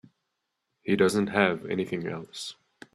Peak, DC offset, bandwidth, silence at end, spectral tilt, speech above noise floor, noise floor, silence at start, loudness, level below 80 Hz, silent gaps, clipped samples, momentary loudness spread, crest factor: -6 dBFS; under 0.1%; 13.5 kHz; 0.4 s; -5.5 dB/octave; 55 dB; -81 dBFS; 0.85 s; -27 LUFS; -66 dBFS; none; under 0.1%; 15 LU; 24 dB